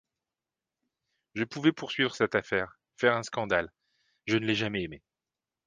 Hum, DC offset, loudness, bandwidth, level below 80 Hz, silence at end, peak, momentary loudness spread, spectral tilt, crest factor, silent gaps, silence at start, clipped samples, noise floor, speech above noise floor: none; under 0.1%; -29 LUFS; 9.6 kHz; -62 dBFS; 0.7 s; -10 dBFS; 13 LU; -5 dB/octave; 22 dB; none; 1.35 s; under 0.1%; under -90 dBFS; over 61 dB